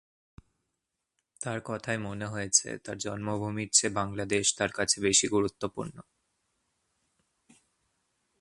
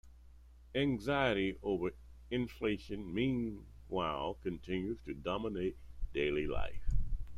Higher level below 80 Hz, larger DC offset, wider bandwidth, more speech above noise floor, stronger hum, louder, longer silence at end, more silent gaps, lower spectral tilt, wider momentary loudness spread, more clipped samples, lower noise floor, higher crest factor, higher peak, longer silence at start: second, -60 dBFS vs -44 dBFS; neither; about the same, 11.5 kHz vs 11 kHz; first, 54 dB vs 21 dB; neither; first, -28 LUFS vs -37 LUFS; first, 2.4 s vs 0 s; neither; second, -2.5 dB/octave vs -7 dB/octave; first, 13 LU vs 8 LU; neither; first, -84 dBFS vs -57 dBFS; first, 26 dB vs 18 dB; first, -6 dBFS vs -18 dBFS; first, 1.4 s vs 0.05 s